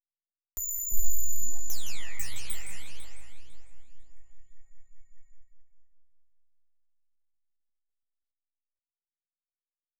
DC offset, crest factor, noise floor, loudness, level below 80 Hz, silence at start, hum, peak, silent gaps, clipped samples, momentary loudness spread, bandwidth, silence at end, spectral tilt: under 0.1%; 16 dB; under -90 dBFS; -34 LUFS; -48 dBFS; 0 s; none; -10 dBFS; none; under 0.1%; 19 LU; over 20 kHz; 0 s; -1 dB/octave